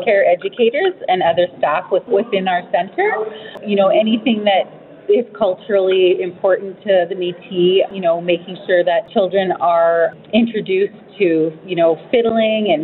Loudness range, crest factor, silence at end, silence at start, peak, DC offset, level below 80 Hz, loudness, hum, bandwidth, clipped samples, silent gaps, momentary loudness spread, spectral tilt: 1 LU; 14 dB; 0 s; 0 s; -2 dBFS; under 0.1%; -64 dBFS; -16 LUFS; none; 4.3 kHz; under 0.1%; none; 6 LU; -9.5 dB/octave